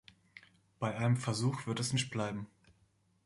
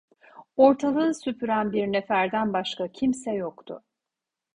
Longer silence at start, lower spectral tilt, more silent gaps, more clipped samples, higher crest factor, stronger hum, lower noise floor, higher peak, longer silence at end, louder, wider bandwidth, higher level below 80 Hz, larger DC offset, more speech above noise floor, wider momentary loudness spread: about the same, 0.35 s vs 0.35 s; about the same, -5 dB/octave vs -5.5 dB/octave; neither; neither; about the same, 18 dB vs 20 dB; neither; second, -72 dBFS vs -87 dBFS; second, -18 dBFS vs -6 dBFS; about the same, 0.8 s vs 0.8 s; second, -35 LUFS vs -25 LUFS; about the same, 11.5 kHz vs 10.5 kHz; about the same, -68 dBFS vs -64 dBFS; neither; second, 38 dB vs 63 dB; second, 13 LU vs 16 LU